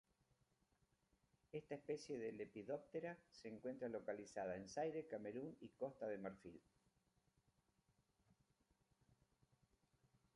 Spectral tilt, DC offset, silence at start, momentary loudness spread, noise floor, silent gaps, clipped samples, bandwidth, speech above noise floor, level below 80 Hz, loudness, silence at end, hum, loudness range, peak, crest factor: -6 dB/octave; under 0.1%; 1.55 s; 9 LU; -84 dBFS; none; under 0.1%; 11 kHz; 33 dB; -84 dBFS; -51 LUFS; 3.75 s; none; 6 LU; -34 dBFS; 20 dB